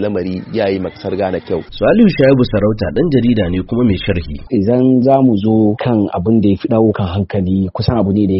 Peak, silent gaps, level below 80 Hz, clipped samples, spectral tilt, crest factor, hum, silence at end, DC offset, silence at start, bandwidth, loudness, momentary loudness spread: 0 dBFS; none; -34 dBFS; under 0.1%; -7 dB/octave; 12 dB; none; 0 s; under 0.1%; 0 s; 5.8 kHz; -14 LUFS; 9 LU